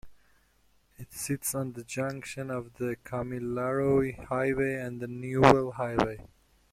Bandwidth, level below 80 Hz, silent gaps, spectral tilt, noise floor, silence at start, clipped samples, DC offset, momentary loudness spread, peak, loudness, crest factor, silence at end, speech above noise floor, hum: 16 kHz; -54 dBFS; none; -5.5 dB/octave; -67 dBFS; 0.05 s; under 0.1%; under 0.1%; 14 LU; -2 dBFS; -29 LUFS; 28 dB; 0.5 s; 38 dB; none